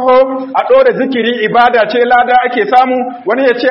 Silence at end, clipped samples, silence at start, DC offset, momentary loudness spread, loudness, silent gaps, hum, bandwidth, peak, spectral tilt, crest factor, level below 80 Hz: 0 s; 0.2%; 0 s; under 0.1%; 5 LU; -10 LUFS; none; none; 5.8 kHz; 0 dBFS; -6.5 dB/octave; 10 dB; -50 dBFS